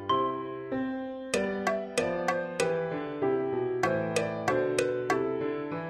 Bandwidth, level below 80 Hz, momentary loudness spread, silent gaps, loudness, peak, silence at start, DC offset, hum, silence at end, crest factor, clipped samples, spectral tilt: 13.5 kHz; -62 dBFS; 5 LU; none; -30 LUFS; -10 dBFS; 0 s; under 0.1%; none; 0 s; 20 dB; under 0.1%; -5 dB/octave